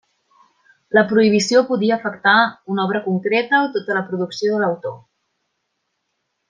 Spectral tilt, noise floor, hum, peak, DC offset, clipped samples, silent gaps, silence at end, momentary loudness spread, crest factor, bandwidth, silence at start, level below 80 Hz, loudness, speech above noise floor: -5 dB/octave; -74 dBFS; none; -2 dBFS; under 0.1%; under 0.1%; none; 1.5 s; 8 LU; 18 dB; 9.8 kHz; 0.9 s; -68 dBFS; -18 LUFS; 56 dB